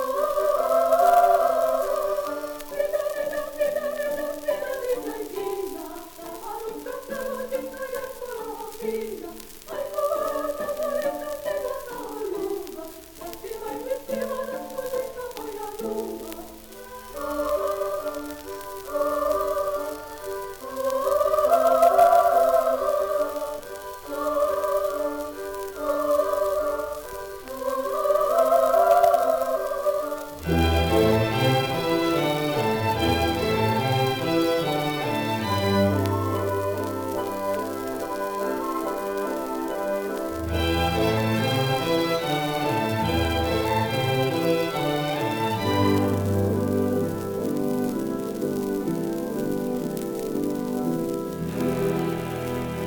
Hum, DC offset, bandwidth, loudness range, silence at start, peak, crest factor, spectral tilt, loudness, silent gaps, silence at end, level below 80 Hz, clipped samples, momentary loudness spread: none; under 0.1%; 18 kHz; 10 LU; 0 s; -6 dBFS; 18 dB; -5.5 dB/octave; -25 LUFS; none; 0 s; -48 dBFS; under 0.1%; 14 LU